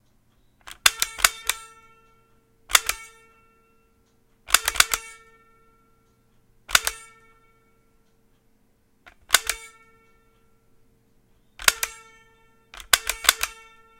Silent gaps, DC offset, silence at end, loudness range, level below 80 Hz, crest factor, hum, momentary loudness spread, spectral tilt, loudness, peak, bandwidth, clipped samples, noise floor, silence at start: none; under 0.1%; 0.45 s; 6 LU; -52 dBFS; 28 dB; none; 16 LU; 2 dB/octave; -21 LUFS; 0 dBFS; 17 kHz; under 0.1%; -63 dBFS; 0.7 s